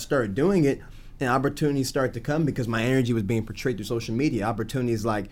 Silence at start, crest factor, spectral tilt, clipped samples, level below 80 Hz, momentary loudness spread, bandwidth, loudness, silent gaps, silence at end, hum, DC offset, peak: 0 s; 14 dB; -6.5 dB/octave; under 0.1%; -44 dBFS; 6 LU; 17 kHz; -25 LUFS; none; 0 s; none; under 0.1%; -10 dBFS